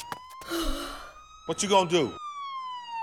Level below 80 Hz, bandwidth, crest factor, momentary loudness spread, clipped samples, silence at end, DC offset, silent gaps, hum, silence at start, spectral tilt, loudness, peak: -42 dBFS; 19.5 kHz; 20 dB; 18 LU; under 0.1%; 0 s; under 0.1%; none; none; 0 s; -3.5 dB/octave; -29 LUFS; -10 dBFS